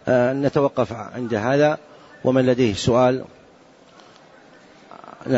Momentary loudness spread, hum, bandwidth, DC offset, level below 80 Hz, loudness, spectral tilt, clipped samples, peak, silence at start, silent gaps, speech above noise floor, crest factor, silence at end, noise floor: 13 LU; none; 8 kHz; under 0.1%; -54 dBFS; -20 LUFS; -6.5 dB/octave; under 0.1%; -6 dBFS; 0.05 s; none; 31 dB; 16 dB; 0 s; -50 dBFS